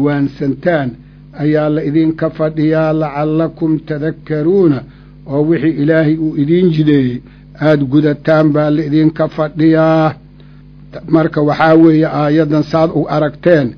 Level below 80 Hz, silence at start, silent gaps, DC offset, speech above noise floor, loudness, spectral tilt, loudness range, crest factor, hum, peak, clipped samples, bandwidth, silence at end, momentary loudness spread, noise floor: -42 dBFS; 0 s; none; under 0.1%; 26 dB; -13 LUFS; -9.5 dB/octave; 3 LU; 12 dB; none; 0 dBFS; 0.2%; 5.4 kHz; 0 s; 7 LU; -38 dBFS